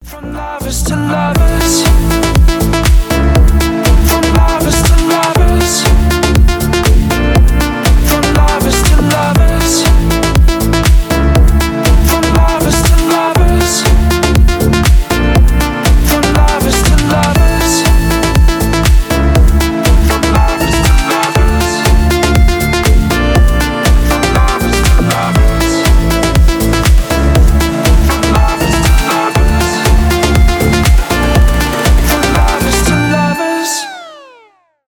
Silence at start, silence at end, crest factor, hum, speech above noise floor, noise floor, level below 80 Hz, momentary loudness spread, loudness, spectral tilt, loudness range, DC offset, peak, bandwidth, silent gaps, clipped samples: 0 s; 0.7 s; 8 dB; none; 35 dB; -47 dBFS; -10 dBFS; 2 LU; -10 LUFS; -5 dB/octave; 1 LU; under 0.1%; 0 dBFS; over 20 kHz; none; under 0.1%